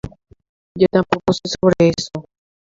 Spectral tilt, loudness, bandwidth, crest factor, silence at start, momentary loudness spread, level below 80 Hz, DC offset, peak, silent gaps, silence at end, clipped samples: -6 dB/octave; -17 LUFS; 7.8 kHz; 18 dB; 0.05 s; 19 LU; -46 dBFS; under 0.1%; 0 dBFS; 0.49-0.75 s; 0.4 s; under 0.1%